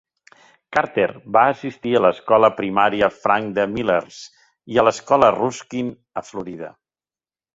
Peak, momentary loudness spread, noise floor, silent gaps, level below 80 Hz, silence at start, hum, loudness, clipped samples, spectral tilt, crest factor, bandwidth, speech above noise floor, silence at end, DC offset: -2 dBFS; 16 LU; under -90 dBFS; none; -56 dBFS; 0.7 s; none; -19 LUFS; under 0.1%; -5 dB/octave; 18 dB; 8 kHz; over 71 dB; 0.85 s; under 0.1%